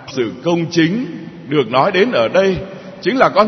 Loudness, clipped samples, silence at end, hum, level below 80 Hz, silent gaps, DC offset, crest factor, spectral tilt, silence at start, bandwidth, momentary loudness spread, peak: -16 LUFS; under 0.1%; 0 s; none; -50 dBFS; none; under 0.1%; 16 dB; -6 dB/octave; 0 s; 6.4 kHz; 11 LU; 0 dBFS